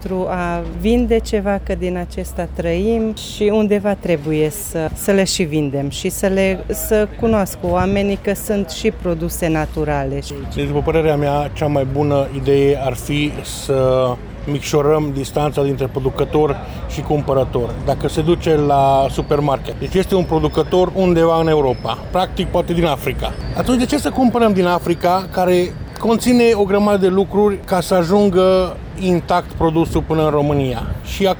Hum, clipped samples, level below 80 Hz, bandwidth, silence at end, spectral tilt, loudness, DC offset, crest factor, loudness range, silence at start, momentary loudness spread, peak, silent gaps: none; under 0.1%; -32 dBFS; over 20 kHz; 0 s; -6 dB/octave; -17 LUFS; under 0.1%; 12 dB; 4 LU; 0 s; 8 LU; -4 dBFS; none